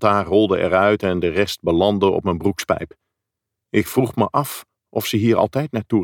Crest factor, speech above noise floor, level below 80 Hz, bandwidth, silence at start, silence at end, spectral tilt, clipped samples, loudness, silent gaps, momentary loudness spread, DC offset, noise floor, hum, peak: 16 dB; 64 dB; -48 dBFS; 19 kHz; 0 s; 0 s; -6 dB/octave; under 0.1%; -19 LUFS; none; 8 LU; under 0.1%; -82 dBFS; none; -2 dBFS